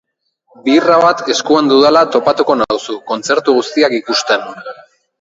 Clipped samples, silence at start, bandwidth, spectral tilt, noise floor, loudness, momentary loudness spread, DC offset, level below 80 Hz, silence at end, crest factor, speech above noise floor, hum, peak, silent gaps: under 0.1%; 0.65 s; 8 kHz; -3.5 dB/octave; -57 dBFS; -12 LUFS; 12 LU; under 0.1%; -58 dBFS; 0.5 s; 14 dB; 45 dB; none; 0 dBFS; none